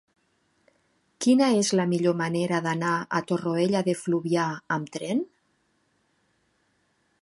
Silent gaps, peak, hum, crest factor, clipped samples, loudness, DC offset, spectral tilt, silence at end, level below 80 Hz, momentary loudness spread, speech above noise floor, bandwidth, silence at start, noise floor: none; -10 dBFS; none; 18 dB; under 0.1%; -25 LUFS; under 0.1%; -5.5 dB/octave; 1.95 s; -72 dBFS; 8 LU; 46 dB; 11.5 kHz; 1.2 s; -70 dBFS